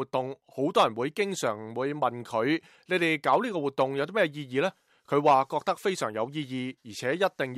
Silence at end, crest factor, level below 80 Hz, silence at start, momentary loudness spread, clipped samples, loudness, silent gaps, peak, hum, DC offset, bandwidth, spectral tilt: 0 s; 16 dB; -76 dBFS; 0 s; 8 LU; under 0.1%; -28 LUFS; none; -12 dBFS; none; under 0.1%; 15 kHz; -5 dB/octave